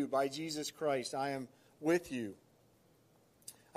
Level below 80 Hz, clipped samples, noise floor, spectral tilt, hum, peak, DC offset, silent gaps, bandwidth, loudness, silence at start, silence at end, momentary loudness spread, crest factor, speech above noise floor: -78 dBFS; under 0.1%; -69 dBFS; -4.5 dB/octave; none; -20 dBFS; under 0.1%; none; 15 kHz; -37 LUFS; 0 s; 0.25 s; 18 LU; 18 dB; 32 dB